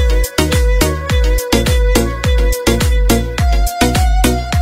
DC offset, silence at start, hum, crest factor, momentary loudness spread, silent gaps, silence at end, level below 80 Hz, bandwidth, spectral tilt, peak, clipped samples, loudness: under 0.1%; 0 s; none; 12 dB; 2 LU; none; 0 s; -14 dBFS; 16.5 kHz; -5 dB/octave; 0 dBFS; under 0.1%; -14 LUFS